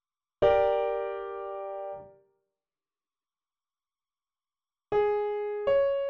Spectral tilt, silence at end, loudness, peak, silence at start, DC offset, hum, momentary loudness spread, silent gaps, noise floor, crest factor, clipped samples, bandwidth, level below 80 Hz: -7 dB/octave; 0 s; -29 LUFS; -12 dBFS; 0.4 s; under 0.1%; none; 13 LU; none; under -90 dBFS; 20 dB; under 0.1%; 5.6 kHz; -58 dBFS